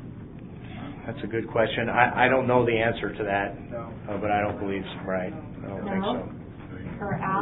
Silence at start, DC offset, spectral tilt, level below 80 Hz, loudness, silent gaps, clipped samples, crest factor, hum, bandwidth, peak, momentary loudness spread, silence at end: 0 s; under 0.1%; -10.5 dB/octave; -48 dBFS; -26 LUFS; none; under 0.1%; 24 dB; none; 4.1 kHz; -2 dBFS; 17 LU; 0 s